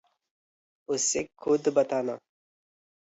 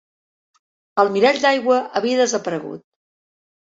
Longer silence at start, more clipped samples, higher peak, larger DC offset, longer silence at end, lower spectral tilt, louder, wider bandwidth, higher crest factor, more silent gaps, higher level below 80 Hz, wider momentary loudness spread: about the same, 0.9 s vs 0.95 s; neither; second, -10 dBFS vs -2 dBFS; neither; about the same, 0.9 s vs 1 s; about the same, -3 dB/octave vs -3.5 dB/octave; second, -27 LUFS vs -18 LUFS; about the same, 8.2 kHz vs 8 kHz; about the same, 20 dB vs 18 dB; neither; about the same, -70 dBFS vs -68 dBFS; second, 10 LU vs 13 LU